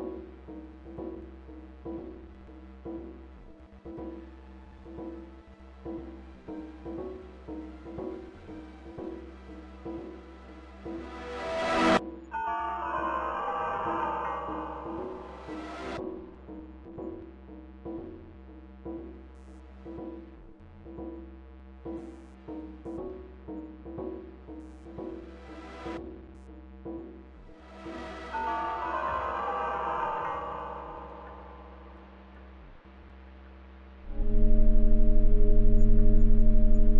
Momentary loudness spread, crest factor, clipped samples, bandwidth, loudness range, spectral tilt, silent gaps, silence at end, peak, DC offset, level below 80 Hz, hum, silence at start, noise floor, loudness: 22 LU; 18 dB; under 0.1%; 5.8 kHz; 14 LU; -7 dB/octave; none; 0 s; -10 dBFS; under 0.1%; -30 dBFS; none; 0 s; -50 dBFS; -34 LUFS